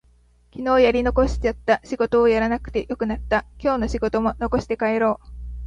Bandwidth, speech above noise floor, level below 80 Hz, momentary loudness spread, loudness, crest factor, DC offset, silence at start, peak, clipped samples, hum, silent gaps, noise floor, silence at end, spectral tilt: 9.4 kHz; 35 dB; -34 dBFS; 9 LU; -21 LUFS; 18 dB; under 0.1%; 0.55 s; -4 dBFS; under 0.1%; none; none; -56 dBFS; 0 s; -6.5 dB/octave